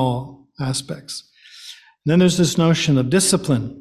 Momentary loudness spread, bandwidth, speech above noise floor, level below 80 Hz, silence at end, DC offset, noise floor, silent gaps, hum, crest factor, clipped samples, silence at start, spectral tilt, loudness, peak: 21 LU; 14.5 kHz; 24 dB; -50 dBFS; 0 s; under 0.1%; -42 dBFS; none; none; 16 dB; under 0.1%; 0 s; -5 dB/octave; -18 LUFS; -4 dBFS